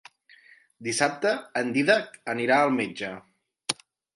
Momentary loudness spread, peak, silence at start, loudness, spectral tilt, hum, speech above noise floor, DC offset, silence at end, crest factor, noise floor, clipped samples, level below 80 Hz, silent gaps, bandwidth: 14 LU; -6 dBFS; 0.8 s; -26 LUFS; -3.5 dB/octave; none; 31 dB; under 0.1%; 0.4 s; 22 dB; -56 dBFS; under 0.1%; -74 dBFS; none; 11.5 kHz